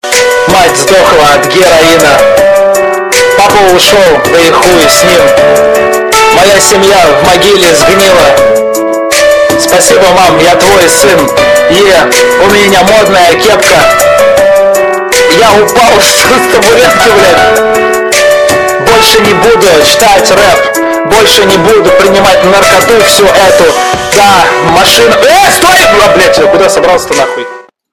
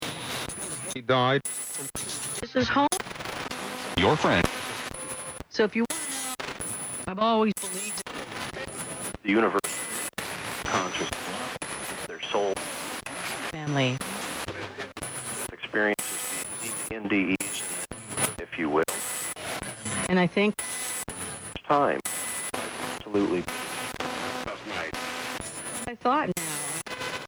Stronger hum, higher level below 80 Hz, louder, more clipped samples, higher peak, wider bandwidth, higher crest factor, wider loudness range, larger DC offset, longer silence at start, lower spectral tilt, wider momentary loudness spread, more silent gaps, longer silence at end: neither; first, -32 dBFS vs -54 dBFS; first, -3 LUFS vs -29 LUFS; first, 10% vs under 0.1%; first, 0 dBFS vs -4 dBFS; about the same, over 20 kHz vs over 20 kHz; second, 4 dB vs 26 dB; second, 1 LU vs 4 LU; neither; about the same, 0.05 s vs 0 s; about the same, -2.5 dB/octave vs -3.5 dB/octave; second, 4 LU vs 10 LU; neither; first, 0.3 s vs 0 s